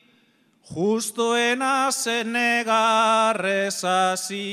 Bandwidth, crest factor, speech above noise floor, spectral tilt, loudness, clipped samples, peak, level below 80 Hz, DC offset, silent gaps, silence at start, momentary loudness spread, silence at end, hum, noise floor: 16 kHz; 16 dB; 40 dB; -2.5 dB/octave; -21 LUFS; under 0.1%; -8 dBFS; -72 dBFS; under 0.1%; none; 0.7 s; 6 LU; 0 s; none; -61 dBFS